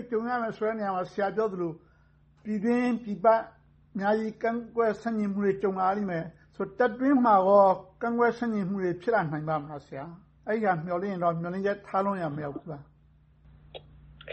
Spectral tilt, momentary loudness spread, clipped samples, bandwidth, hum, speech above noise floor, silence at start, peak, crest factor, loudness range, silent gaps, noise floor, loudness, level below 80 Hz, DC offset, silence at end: -8.5 dB/octave; 18 LU; under 0.1%; 8.4 kHz; none; 34 dB; 0 s; -10 dBFS; 18 dB; 6 LU; none; -61 dBFS; -27 LUFS; -62 dBFS; under 0.1%; 0 s